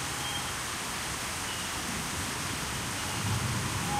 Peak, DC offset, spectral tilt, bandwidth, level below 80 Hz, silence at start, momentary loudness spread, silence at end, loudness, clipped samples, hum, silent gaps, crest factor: -18 dBFS; under 0.1%; -2.5 dB/octave; 16 kHz; -48 dBFS; 0 s; 2 LU; 0 s; -32 LUFS; under 0.1%; none; none; 14 dB